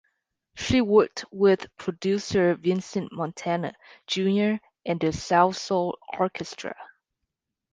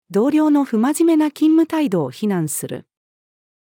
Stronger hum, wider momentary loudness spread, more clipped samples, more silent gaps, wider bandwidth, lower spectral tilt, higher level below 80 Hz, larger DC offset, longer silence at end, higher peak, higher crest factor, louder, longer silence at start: neither; first, 13 LU vs 9 LU; neither; neither; second, 9.6 kHz vs 17.5 kHz; about the same, -5.5 dB/octave vs -6 dB/octave; first, -52 dBFS vs -74 dBFS; neither; about the same, 0.85 s vs 0.85 s; about the same, -6 dBFS vs -6 dBFS; first, 20 dB vs 12 dB; second, -25 LUFS vs -17 LUFS; first, 0.55 s vs 0.1 s